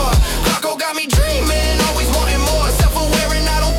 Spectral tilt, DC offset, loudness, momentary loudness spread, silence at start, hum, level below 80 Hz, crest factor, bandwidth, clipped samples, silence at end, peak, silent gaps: -4 dB/octave; under 0.1%; -16 LUFS; 2 LU; 0 s; none; -18 dBFS; 12 dB; 17.5 kHz; under 0.1%; 0 s; -4 dBFS; none